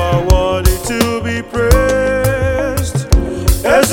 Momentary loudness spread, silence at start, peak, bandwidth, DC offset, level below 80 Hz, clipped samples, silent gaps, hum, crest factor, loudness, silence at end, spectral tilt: 5 LU; 0 s; 0 dBFS; 19.5 kHz; under 0.1%; -18 dBFS; 0.5%; none; none; 12 dB; -14 LUFS; 0 s; -5 dB/octave